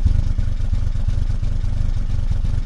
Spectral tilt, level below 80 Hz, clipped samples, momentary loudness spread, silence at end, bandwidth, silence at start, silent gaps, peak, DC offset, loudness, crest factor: -7.5 dB/octave; -18 dBFS; under 0.1%; 2 LU; 0 s; 6.6 kHz; 0 s; none; -4 dBFS; under 0.1%; -24 LUFS; 12 dB